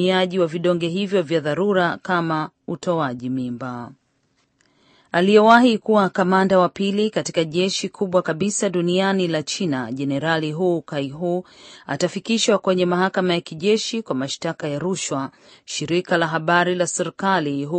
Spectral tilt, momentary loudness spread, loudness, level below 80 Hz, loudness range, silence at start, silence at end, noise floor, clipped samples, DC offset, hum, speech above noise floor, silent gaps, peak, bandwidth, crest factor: -4.5 dB/octave; 9 LU; -20 LUFS; -64 dBFS; 6 LU; 0 s; 0 s; -66 dBFS; under 0.1%; under 0.1%; none; 46 dB; none; 0 dBFS; 8.8 kHz; 20 dB